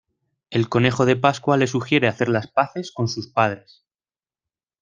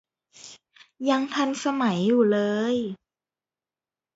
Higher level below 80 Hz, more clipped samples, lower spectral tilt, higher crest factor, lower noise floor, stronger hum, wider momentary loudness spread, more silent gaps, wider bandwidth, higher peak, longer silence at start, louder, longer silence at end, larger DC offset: first, -58 dBFS vs -72 dBFS; neither; about the same, -6 dB/octave vs -5.5 dB/octave; first, 22 dB vs 16 dB; about the same, under -90 dBFS vs under -90 dBFS; neither; second, 8 LU vs 23 LU; neither; first, 9.4 kHz vs 8 kHz; first, 0 dBFS vs -10 dBFS; about the same, 0.5 s vs 0.45 s; first, -21 LUFS vs -24 LUFS; about the same, 1.25 s vs 1.2 s; neither